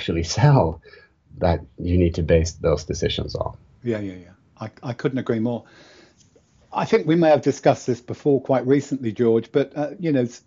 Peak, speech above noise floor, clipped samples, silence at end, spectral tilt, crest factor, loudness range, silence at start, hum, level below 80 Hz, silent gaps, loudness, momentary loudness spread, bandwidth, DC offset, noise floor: -4 dBFS; 35 dB; under 0.1%; 0.1 s; -6.5 dB/octave; 18 dB; 8 LU; 0 s; none; -40 dBFS; none; -21 LUFS; 14 LU; 7.8 kHz; under 0.1%; -56 dBFS